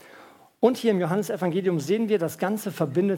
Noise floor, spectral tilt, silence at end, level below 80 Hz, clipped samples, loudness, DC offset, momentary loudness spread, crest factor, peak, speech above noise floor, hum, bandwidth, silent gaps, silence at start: -51 dBFS; -6.5 dB/octave; 0 s; -76 dBFS; under 0.1%; -25 LUFS; under 0.1%; 5 LU; 18 dB; -6 dBFS; 27 dB; none; 18 kHz; none; 0.05 s